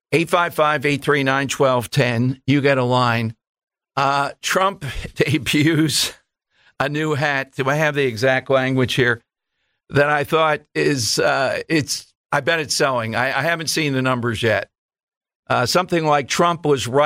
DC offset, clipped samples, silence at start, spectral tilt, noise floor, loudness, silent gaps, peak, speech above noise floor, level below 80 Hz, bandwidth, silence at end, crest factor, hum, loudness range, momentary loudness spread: under 0.1%; under 0.1%; 0.1 s; -4.5 dB/octave; -73 dBFS; -19 LUFS; 3.49-3.55 s, 3.63-3.67 s, 12.17-12.24 s, 14.78-14.89 s, 15.03-15.07 s, 15.17-15.21 s, 15.36-15.43 s; -4 dBFS; 55 dB; -50 dBFS; 16 kHz; 0 s; 16 dB; none; 1 LU; 6 LU